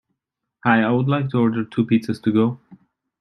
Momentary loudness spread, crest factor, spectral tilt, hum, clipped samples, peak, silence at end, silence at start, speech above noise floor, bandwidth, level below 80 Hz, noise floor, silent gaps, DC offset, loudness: 6 LU; 18 dB; -8.5 dB/octave; none; under 0.1%; -2 dBFS; 0.45 s; 0.65 s; 62 dB; 10 kHz; -62 dBFS; -81 dBFS; none; under 0.1%; -20 LUFS